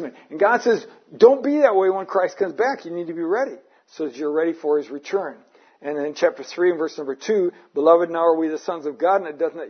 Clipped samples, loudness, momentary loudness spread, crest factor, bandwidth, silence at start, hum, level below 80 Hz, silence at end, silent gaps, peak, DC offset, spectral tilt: under 0.1%; -21 LUFS; 12 LU; 20 dB; 6.6 kHz; 0 s; none; -78 dBFS; 0 s; none; -2 dBFS; under 0.1%; -5 dB/octave